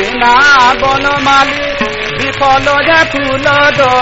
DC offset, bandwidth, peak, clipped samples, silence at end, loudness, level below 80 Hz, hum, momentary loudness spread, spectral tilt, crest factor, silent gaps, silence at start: under 0.1%; 8 kHz; 0 dBFS; under 0.1%; 0 s; -8 LUFS; -32 dBFS; none; 9 LU; -3.5 dB/octave; 10 dB; none; 0 s